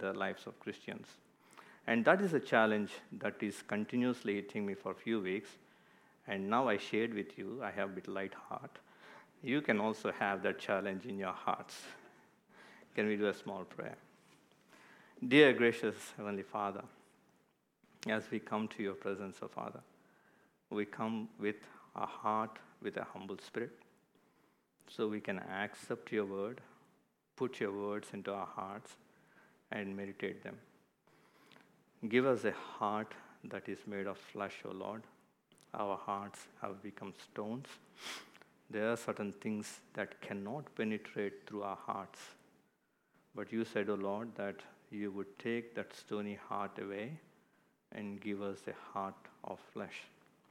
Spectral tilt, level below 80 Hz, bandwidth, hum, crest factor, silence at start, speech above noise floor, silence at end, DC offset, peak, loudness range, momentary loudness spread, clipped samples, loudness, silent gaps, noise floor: -5.5 dB/octave; under -90 dBFS; 15.5 kHz; none; 28 dB; 0 s; 39 dB; 0.45 s; under 0.1%; -12 dBFS; 11 LU; 17 LU; under 0.1%; -39 LUFS; none; -77 dBFS